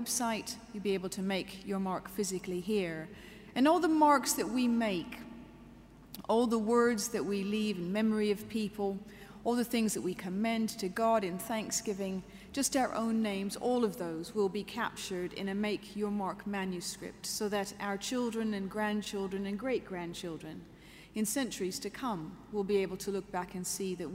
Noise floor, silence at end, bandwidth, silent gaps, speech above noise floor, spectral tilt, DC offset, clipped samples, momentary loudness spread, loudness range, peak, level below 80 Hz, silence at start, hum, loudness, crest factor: -54 dBFS; 0 s; 16 kHz; none; 21 dB; -4 dB/octave; under 0.1%; under 0.1%; 12 LU; 6 LU; -14 dBFS; -62 dBFS; 0 s; none; -34 LUFS; 20 dB